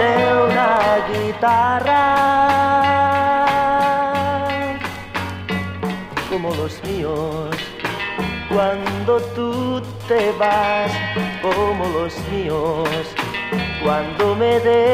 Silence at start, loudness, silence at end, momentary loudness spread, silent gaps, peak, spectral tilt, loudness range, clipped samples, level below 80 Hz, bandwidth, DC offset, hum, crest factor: 0 s; -19 LUFS; 0 s; 9 LU; none; -4 dBFS; -5.5 dB/octave; 8 LU; under 0.1%; -42 dBFS; 16 kHz; under 0.1%; none; 14 dB